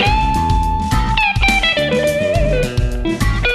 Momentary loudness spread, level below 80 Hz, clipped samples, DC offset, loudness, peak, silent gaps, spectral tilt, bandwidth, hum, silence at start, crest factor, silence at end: 6 LU; -20 dBFS; under 0.1%; under 0.1%; -15 LUFS; -2 dBFS; none; -5 dB/octave; 13.5 kHz; none; 0 s; 14 dB; 0 s